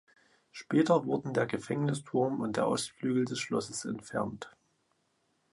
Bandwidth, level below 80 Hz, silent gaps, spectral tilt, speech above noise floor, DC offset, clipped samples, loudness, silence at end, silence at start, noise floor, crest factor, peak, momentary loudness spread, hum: 11.5 kHz; -70 dBFS; none; -5.5 dB/octave; 44 dB; under 0.1%; under 0.1%; -32 LUFS; 1.05 s; 0.55 s; -75 dBFS; 20 dB; -12 dBFS; 11 LU; none